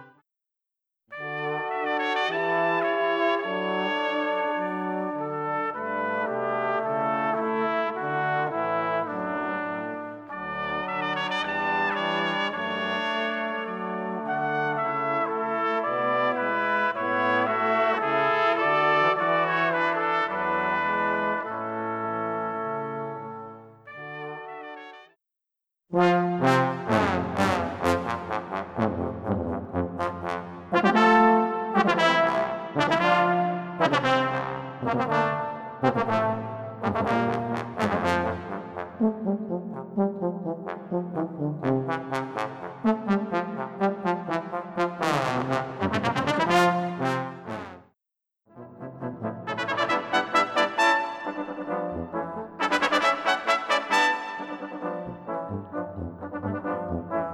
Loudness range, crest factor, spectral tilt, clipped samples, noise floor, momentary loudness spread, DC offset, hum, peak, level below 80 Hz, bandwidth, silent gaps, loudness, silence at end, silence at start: 6 LU; 20 dB; -5.5 dB/octave; under 0.1%; -87 dBFS; 12 LU; under 0.1%; none; -6 dBFS; -60 dBFS; 14.5 kHz; none; -26 LUFS; 0 s; 0 s